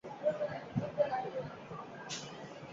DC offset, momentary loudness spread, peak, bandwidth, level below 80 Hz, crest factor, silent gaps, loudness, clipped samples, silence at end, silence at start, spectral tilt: under 0.1%; 12 LU; -18 dBFS; 7.6 kHz; -70 dBFS; 20 dB; none; -39 LUFS; under 0.1%; 0 s; 0.05 s; -4.5 dB/octave